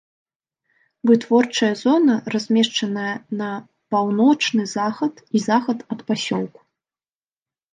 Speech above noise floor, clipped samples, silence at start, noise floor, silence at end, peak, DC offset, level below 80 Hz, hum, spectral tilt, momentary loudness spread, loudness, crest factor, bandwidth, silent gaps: over 71 dB; under 0.1%; 1.05 s; under -90 dBFS; 1.25 s; -4 dBFS; under 0.1%; -72 dBFS; none; -4.5 dB/octave; 10 LU; -20 LUFS; 18 dB; 9.6 kHz; none